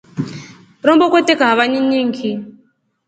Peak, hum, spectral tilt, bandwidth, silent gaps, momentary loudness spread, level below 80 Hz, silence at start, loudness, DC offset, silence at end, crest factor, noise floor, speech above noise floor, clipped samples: 0 dBFS; none; -5 dB/octave; 9 kHz; none; 15 LU; -62 dBFS; 0.15 s; -14 LUFS; under 0.1%; 0.6 s; 16 dB; -57 dBFS; 43 dB; under 0.1%